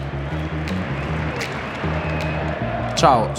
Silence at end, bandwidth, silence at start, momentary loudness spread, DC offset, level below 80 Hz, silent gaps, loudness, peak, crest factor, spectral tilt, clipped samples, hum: 0 s; 15.5 kHz; 0 s; 9 LU; under 0.1%; -36 dBFS; none; -23 LUFS; -2 dBFS; 20 dB; -5.5 dB/octave; under 0.1%; none